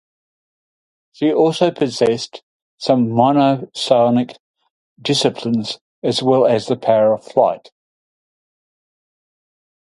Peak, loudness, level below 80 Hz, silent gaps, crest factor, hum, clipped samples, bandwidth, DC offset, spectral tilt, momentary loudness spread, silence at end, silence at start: 0 dBFS; -17 LUFS; -62 dBFS; 2.43-2.78 s, 4.40-4.54 s, 4.71-4.96 s, 5.81-6.02 s; 18 dB; none; under 0.1%; 11.5 kHz; under 0.1%; -5.5 dB/octave; 10 LU; 2.25 s; 1.2 s